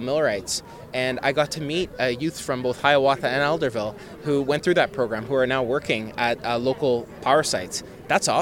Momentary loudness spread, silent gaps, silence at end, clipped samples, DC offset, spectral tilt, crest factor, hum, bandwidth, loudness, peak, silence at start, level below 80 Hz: 8 LU; none; 0 s; under 0.1%; under 0.1%; -4 dB/octave; 20 dB; none; 17.5 kHz; -23 LUFS; -2 dBFS; 0 s; -54 dBFS